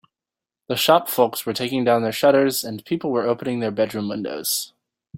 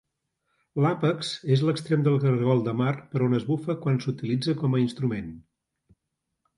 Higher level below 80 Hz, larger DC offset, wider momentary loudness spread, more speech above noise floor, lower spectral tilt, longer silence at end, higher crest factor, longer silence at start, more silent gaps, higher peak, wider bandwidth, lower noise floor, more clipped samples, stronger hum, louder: about the same, -64 dBFS vs -62 dBFS; neither; first, 10 LU vs 7 LU; first, 68 dB vs 57 dB; second, -4 dB/octave vs -7.5 dB/octave; second, 0 s vs 1.2 s; about the same, 20 dB vs 16 dB; about the same, 0.7 s vs 0.75 s; neither; first, -2 dBFS vs -10 dBFS; first, 16.5 kHz vs 11 kHz; first, -89 dBFS vs -82 dBFS; neither; neither; first, -21 LUFS vs -26 LUFS